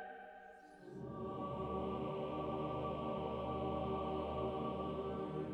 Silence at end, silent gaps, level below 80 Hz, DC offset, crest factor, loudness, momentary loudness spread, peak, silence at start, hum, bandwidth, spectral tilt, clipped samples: 0 s; none; -58 dBFS; under 0.1%; 14 dB; -42 LUFS; 13 LU; -28 dBFS; 0 s; none; 9.4 kHz; -8.5 dB/octave; under 0.1%